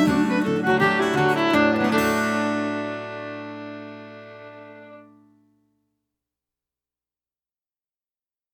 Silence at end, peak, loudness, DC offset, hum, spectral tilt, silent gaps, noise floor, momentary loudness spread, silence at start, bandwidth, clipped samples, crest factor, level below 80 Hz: 3.5 s; -6 dBFS; -21 LUFS; under 0.1%; none; -5.5 dB/octave; none; under -90 dBFS; 22 LU; 0 s; 17.5 kHz; under 0.1%; 18 dB; -56 dBFS